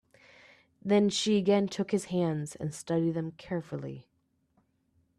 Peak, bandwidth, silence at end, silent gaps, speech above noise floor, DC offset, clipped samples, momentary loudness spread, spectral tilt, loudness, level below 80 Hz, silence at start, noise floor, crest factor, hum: -14 dBFS; 12.5 kHz; 1.2 s; none; 43 dB; under 0.1%; under 0.1%; 14 LU; -5.5 dB/octave; -30 LUFS; -68 dBFS; 0.85 s; -72 dBFS; 18 dB; none